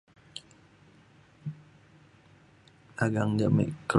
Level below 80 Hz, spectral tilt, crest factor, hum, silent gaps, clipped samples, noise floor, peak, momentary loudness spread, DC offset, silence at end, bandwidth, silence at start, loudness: -60 dBFS; -7 dB/octave; 24 dB; none; none; under 0.1%; -59 dBFS; -8 dBFS; 20 LU; under 0.1%; 0 s; 11.5 kHz; 0.35 s; -29 LUFS